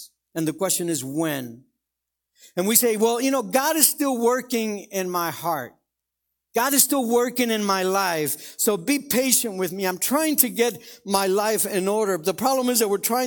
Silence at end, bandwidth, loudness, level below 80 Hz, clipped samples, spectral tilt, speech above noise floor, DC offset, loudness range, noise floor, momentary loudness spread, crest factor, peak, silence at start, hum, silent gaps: 0 s; 19 kHz; -22 LUFS; -68 dBFS; under 0.1%; -3 dB/octave; 61 dB; under 0.1%; 2 LU; -83 dBFS; 10 LU; 22 dB; 0 dBFS; 0 s; none; none